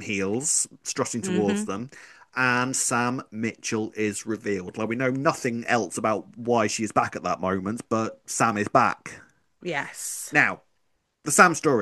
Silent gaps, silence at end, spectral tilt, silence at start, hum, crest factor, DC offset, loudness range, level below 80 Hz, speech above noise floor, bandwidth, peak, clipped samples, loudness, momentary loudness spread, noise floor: none; 0 s; -3.5 dB/octave; 0 s; none; 24 dB; under 0.1%; 2 LU; -68 dBFS; 47 dB; 12.5 kHz; 0 dBFS; under 0.1%; -25 LUFS; 10 LU; -72 dBFS